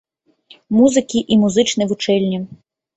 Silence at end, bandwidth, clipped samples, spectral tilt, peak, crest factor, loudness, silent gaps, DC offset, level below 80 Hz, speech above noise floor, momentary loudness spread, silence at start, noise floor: 0.4 s; 8.2 kHz; under 0.1%; -5 dB/octave; -2 dBFS; 16 dB; -16 LUFS; none; under 0.1%; -54 dBFS; 34 dB; 9 LU; 0.7 s; -50 dBFS